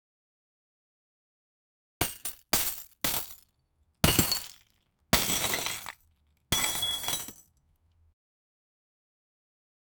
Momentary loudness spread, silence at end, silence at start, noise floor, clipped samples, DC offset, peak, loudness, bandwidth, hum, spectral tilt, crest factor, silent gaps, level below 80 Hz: 13 LU; 2.65 s; 2 s; -72 dBFS; under 0.1%; under 0.1%; -6 dBFS; -28 LUFS; over 20 kHz; none; -2 dB/octave; 28 dB; none; -50 dBFS